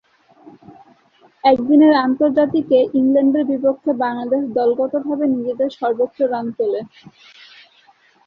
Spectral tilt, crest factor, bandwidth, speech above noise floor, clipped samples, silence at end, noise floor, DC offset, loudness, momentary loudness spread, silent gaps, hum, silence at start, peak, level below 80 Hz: -8 dB/octave; 16 dB; 5.6 kHz; 37 dB; under 0.1%; 1.4 s; -54 dBFS; under 0.1%; -17 LUFS; 8 LU; none; none; 1.45 s; -2 dBFS; -62 dBFS